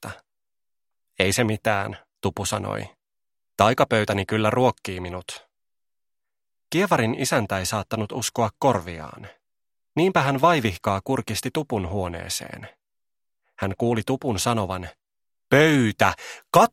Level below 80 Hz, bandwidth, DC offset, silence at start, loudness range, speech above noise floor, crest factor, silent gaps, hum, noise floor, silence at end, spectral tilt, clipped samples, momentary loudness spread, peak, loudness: -54 dBFS; 16 kHz; under 0.1%; 0 s; 4 LU; over 67 dB; 24 dB; none; none; under -90 dBFS; 0.05 s; -5 dB/octave; under 0.1%; 15 LU; 0 dBFS; -23 LUFS